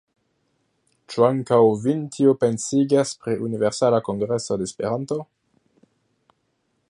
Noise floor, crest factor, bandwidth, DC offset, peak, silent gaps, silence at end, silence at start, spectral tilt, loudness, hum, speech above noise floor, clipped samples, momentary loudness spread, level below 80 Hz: -71 dBFS; 20 dB; 11.5 kHz; under 0.1%; -4 dBFS; none; 1.65 s; 1.1 s; -6 dB/octave; -21 LUFS; none; 50 dB; under 0.1%; 9 LU; -62 dBFS